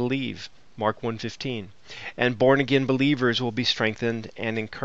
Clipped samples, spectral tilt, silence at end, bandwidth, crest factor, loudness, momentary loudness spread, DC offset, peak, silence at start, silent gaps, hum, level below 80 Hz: under 0.1%; -5.5 dB/octave; 0 s; 7.8 kHz; 20 dB; -25 LUFS; 16 LU; 0.4%; -6 dBFS; 0 s; none; none; -58 dBFS